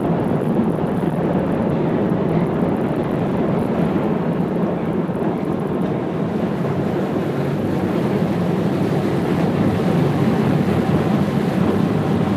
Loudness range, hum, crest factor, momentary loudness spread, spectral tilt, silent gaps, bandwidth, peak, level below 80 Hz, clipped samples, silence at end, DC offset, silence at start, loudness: 3 LU; none; 14 dB; 4 LU; -8.5 dB/octave; none; 14.5 kHz; -6 dBFS; -44 dBFS; under 0.1%; 0 s; under 0.1%; 0 s; -19 LUFS